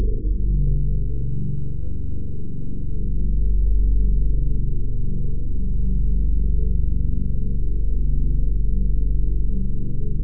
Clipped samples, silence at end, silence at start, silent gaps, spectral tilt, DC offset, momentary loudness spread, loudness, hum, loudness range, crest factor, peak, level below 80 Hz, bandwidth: under 0.1%; 0 s; 0 s; none; -16 dB/octave; 9%; 7 LU; -25 LUFS; none; 2 LU; 12 dB; -8 dBFS; -22 dBFS; 0.6 kHz